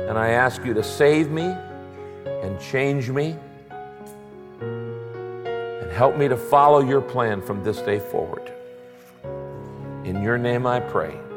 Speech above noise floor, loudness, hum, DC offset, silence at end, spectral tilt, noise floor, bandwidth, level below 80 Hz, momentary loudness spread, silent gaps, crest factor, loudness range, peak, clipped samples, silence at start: 24 dB; -22 LUFS; none; under 0.1%; 0 s; -6.5 dB/octave; -45 dBFS; 17 kHz; -56 dBFS; 21 LU; none; 20 dB; 8 LU; -4 dBFS; under 0.1%; 0 s